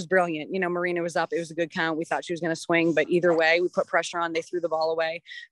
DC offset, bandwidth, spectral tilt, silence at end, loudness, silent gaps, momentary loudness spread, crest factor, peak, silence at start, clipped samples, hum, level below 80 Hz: under 0.1%; 11.5 kHz; -5 dB/octave; 0.05 s; -25 LUFS; none; 8 LU; 18 dB; -8 dBFS; 0 s; under 0.1%; none; -76 dBFS